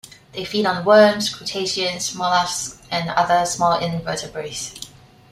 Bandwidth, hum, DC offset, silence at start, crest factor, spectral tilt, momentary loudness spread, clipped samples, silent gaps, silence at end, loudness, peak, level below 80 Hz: 15.5 kHz; none; under 0.1%; 0.05 s; 18 dB; -3 dB/octave; 16 LU; under 0.1%; none; 0.45 s; -19 LUFS; -2 dBFS; -54 dBFS